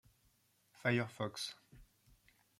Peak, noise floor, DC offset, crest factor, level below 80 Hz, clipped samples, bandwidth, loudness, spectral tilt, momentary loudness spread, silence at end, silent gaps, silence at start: -20 dBFS; -75 dBFS; under 0.1%; 24 dB; -72 dBFS; under 0.1%; 15.5 kHz; -39 LUFS; -5 dB/octave; 9 LU; 0.75 s; none; 0.8 s